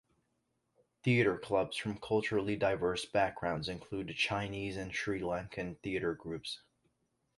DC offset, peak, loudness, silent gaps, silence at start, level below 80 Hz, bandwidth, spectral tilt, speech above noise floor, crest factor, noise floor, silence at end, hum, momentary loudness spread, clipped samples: under 0.1%; -16 dBFS; -35 LUFS; none; 1.05 s; -60 dBFS; 11.5 kHz; -5.5 dB/octave; 46 dB; 20 dB; -81 dBFS; 0.8 s; none; 10 LU; under 0.1%